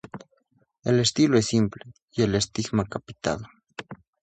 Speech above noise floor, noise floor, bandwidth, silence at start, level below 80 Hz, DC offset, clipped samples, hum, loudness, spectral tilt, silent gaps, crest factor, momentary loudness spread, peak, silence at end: 44 dB; -68 dBFS; 9.4 kHz; 0.15 s; -52 dBFS; under 0.1%; under 0.1%; none; -25 LUFS; -5 dB/octave; 2.02-2.08 s; 20 dB; 22 LU; -6 dBFS; 0.3 s